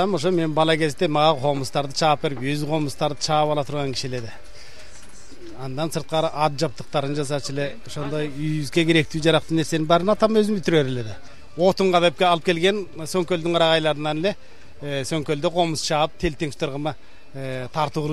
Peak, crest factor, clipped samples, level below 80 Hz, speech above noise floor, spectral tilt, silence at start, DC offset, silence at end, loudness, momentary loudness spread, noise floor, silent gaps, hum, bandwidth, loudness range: -2 dBFS; 20 dB; under 0.1%; -48 dBFS; 23 dB; -5 dB/octave; 0 s; 2%; 0 s; -22 LUFS; 12 LU; -45 dBFS; none; none; 14 kHz; 6 LU